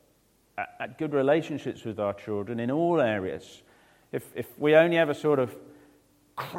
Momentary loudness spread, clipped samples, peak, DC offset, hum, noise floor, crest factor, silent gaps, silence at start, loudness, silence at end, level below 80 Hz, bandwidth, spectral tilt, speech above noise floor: 17 LU; under 0.1%; -6 dBFS; under 0.1%; none; -65 dBFS; 22 dB; none; 0.55 s; -27 LUFS; 0 s; -70 dBFS; 16.5 kHz; -6.5 dB/octave; 39 dB